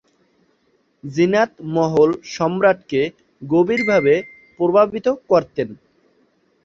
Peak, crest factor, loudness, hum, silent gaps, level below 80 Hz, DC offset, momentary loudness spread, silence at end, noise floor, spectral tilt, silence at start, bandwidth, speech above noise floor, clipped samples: -2 dBFS; 18 dB; -18 LUFS; none; none; -58 dBFS; under 0.1%; 11 LU; 0.9 s; -63 dBFS; -6.5 dB/octave; 1.05 s; 7.6 kHz; 45 dB; under 0.1%